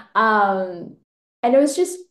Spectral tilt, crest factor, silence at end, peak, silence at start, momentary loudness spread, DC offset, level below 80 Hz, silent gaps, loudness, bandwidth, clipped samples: -4 dB/octave; 14 dB; 0.1 s; -6 dBFS; 0.15 s; 12 LU; under 0.1%; -74 dBFS; 1.04-1.43 s; -18 LUFS; 12.5 kHz; under 0.1%